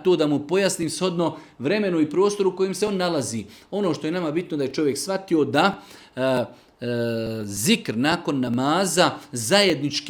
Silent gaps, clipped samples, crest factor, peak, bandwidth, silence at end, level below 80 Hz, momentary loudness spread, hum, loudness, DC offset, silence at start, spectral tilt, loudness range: none; under 0.1%; 20 dB; -2 dBFS; 19 kHz; 0 s; -62 dBFS; 9 LU; none; -23 LUFS; under 0.1%; 0 s; -4.5 dB/octave; 2 LU